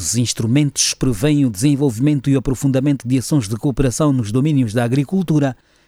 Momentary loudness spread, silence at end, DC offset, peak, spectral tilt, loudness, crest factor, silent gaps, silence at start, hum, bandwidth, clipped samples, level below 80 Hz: 2 LU; 0.35 s; under 0.1%; -2 dBFS; -5.5 dB/octave; -17 LUFS; 14 dB; none; 0 s; none; 15.5 kHz; under 0.1%; -36 dBFS